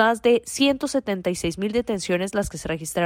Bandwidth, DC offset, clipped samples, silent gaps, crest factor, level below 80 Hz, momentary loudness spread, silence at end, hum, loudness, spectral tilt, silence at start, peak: 16.5 kHz; under 0.1%; under 0.1%; none; 16 dB; -46 dBFS; 7 LU; 0 s; none; -23 LUFS; -4 dB/octave; 0 s; -6 dBFS